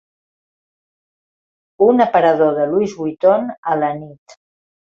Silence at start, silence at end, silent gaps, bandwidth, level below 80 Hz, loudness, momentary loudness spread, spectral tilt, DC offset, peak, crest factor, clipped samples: 1.8 s; 0.75 s; 3.58-3.63 s; 7.4 kHz; -62 dBFS; -16 LUFS; 8 LU; -7 dB/octave; under 0.1%; -2 dBFS; 16 dB; under 0.1%